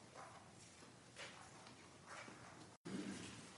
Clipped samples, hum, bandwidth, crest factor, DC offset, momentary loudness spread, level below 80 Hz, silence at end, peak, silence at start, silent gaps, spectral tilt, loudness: under 0.1%; none; 11.5 kHz; 18 dB; under 0.1%; 11 LU; -84 dBFS; 0 s; -38 dBFS; 0 s; 2.77-2.84 s; -4 dB/octave; -56 LUFS